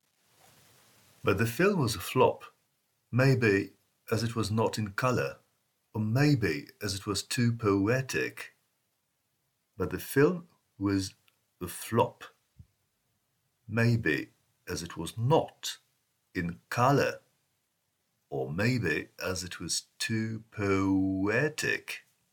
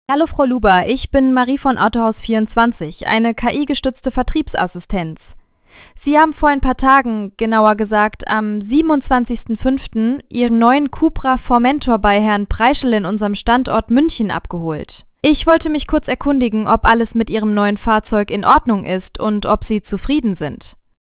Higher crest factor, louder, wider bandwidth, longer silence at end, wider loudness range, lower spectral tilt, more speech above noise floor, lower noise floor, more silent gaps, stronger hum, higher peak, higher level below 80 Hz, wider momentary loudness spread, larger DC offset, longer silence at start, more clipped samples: first, 20 dB vs 14 dB; second, -30 LUFS vs -16 LUFS; first, 19 kHz vs 4 kHz; second, 0.35 s vs 0.5 s; about the same, 5 LU vs 3 LU; second, -5.5 dB/octave vs -10 dB/octave; first, 49 dB vs 31 dB; first, -78 dBFS vs -46 dBFS; neither; neither; second, -10 dBFS vs 0 dBFS; second, -64 dBFS vs -32 dBFS; first, 13 LU vs 8 LU; neither; first, 1.25 s vs 0.1 s; neither